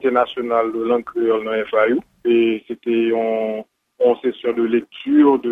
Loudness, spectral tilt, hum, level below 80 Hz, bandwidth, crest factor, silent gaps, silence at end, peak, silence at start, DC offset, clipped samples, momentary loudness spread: -19 LUFS; -7.5 dB/octave; none; -62 dBFS; 3.9 kHz; 16 dB; none; 0 s; -2 dBFS; 0 s; under 0.1%; under 0.1%; 6 LU